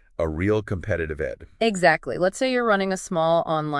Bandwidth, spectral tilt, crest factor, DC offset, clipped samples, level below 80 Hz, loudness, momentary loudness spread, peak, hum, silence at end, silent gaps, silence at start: 12 kHz; -5 dB/octave; 18 dB; under 0.1%; under 0.1%; -46 dBFS; -23 LUFS; 8 LU; -4 dBFS; none; 0 s; none; 0.2 s